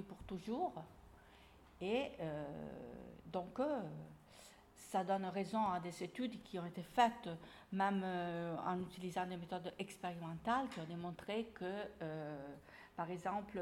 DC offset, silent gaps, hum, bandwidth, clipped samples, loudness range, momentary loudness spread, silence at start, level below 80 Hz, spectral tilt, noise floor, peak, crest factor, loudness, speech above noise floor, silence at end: under 0.1%; none; none; 16.5 kHz; under 0.1%; 5 LU; 16 LU; 0 s; -70 dBFS; -6 dB/octave; -64 dBFS; -20 dBFS; 22 dB; -43 LUFS; 21 dB; 0 s